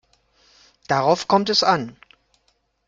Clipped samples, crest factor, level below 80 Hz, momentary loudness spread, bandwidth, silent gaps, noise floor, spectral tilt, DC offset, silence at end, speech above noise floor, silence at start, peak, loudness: under 0.1%; 20 dB; -62 dBFS; 7 LU; 8.8 kHz; none; -67 dBFS; -4 dB/octave; under 0.1%; 0.95 s; 48 dB; 0.9 s; -2 dBFS; -19 LUFS